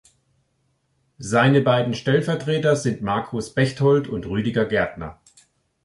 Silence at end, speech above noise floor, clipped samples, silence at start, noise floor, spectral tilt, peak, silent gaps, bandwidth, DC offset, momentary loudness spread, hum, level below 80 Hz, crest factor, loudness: 0.7 s; 48 dB; under 0.1%; 1.2 s; -68 dBFS; -6 dB/octave; -4 dBFS; none; 11.5 kHz; under 0.1%; 10 LU; none; -50 dBFS; 18 dB; -21 LUFS